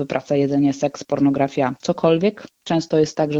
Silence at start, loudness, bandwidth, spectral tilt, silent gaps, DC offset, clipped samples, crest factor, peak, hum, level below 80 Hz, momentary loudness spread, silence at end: 0 s; -20 LUFS; 8 kHz; -6.5 dB/octave; none; under 0.1%; under 0.1%; 16 dB; -2 dBFS; none; -56 dBFS; 6 LU; 0 s